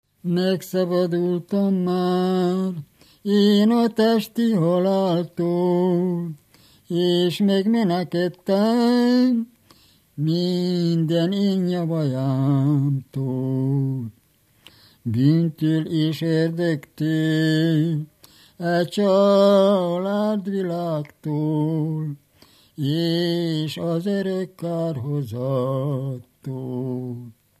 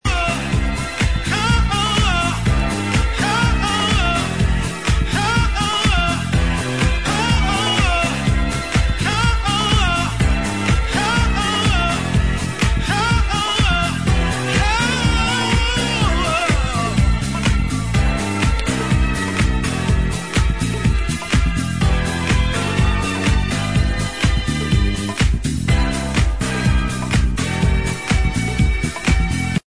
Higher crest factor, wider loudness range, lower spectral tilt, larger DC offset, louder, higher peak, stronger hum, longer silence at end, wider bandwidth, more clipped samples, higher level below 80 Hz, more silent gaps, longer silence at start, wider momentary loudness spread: about the same, 16 dB vs 14 dB; first, 5 LU vs 2 LU; first, -7.5 dB/octave vs -4.5 dB/octave; second, under 0.1% vs 1%; second, -21 LUFS vs -18 LUFS; about the same, -4 dBFS vs -2 dBFS; neither; first, 0.3 s vs 0.05 s; first, 15 kHz vs 11 kHz; neither; second, -70 dBFS vs -22 dBFS; neither; first, 0.25 s vs 0 s; first, 11 LU vs 3 LU